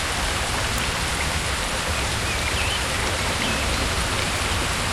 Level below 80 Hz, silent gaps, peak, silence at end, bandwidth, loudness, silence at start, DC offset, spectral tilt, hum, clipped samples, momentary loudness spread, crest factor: -32 dBFS; none; -10 dBFS; 0 s; 16 kHz; -23 LUFS; 0 s; under 0.1%; -2.5 dB/octave; none; under 0.1%; 1 LU; 14 dB